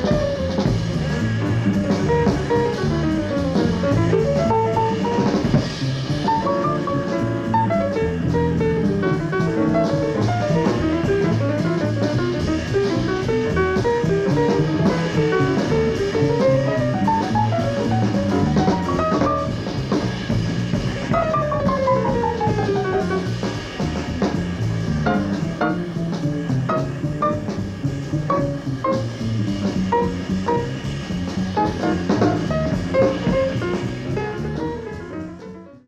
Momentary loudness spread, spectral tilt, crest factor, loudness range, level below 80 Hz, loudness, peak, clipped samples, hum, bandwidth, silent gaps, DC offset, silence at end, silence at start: 6 LU; -7 dB/octave; 14 dB; 4 LU; -38 dBFS; -21 LUFS; -6 dBFS; under 0.1%; none; 11.5 kHz; none; under 0.1%; 0.1 s; 0 s